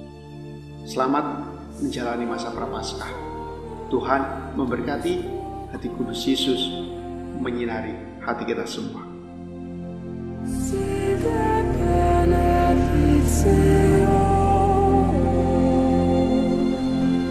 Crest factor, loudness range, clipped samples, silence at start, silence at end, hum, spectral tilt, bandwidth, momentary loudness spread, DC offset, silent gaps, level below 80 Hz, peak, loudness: 18 dB; 11 LU; under 0.1%; 0 s; 0 s; none; -6.5 dB/octave; 13 kHz; 15 LU; 0.1%; none; -32 dBFS; -4 dBFS; -22 LUFS